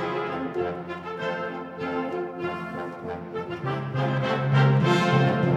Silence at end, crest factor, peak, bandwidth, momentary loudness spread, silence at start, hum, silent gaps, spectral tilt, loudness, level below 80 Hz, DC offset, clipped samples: 0 s; 18 dB; -8 dBFS; 8.4 kHz; 13 LU; 0 s; none; none; -7.5 dB/octave; -26 LUFS; -60 dBFS; under 0.1%; under 0.1%